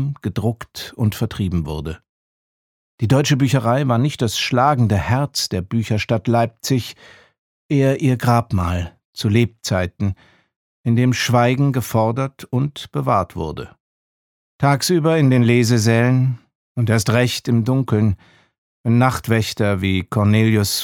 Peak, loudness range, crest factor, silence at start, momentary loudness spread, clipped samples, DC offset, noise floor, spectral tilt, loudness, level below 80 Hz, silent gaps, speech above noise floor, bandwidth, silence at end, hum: -2 dBFS; 4 LU; 18 dB; 0 s; 11 LU; under 0.1%; under 0.1%; under -90 dBFS; -6 dB/octave; -18 LUFS; -44 dBFS; 2.09-2.98 s, 7.38-7.69 s, 9.05-9.13 s, 10.56-10.84 s, 13.80-14.59 s, 16.55-16.75 s, 18.58-18.84 s; over 73 dB; 17.5 kHz; 0 s; none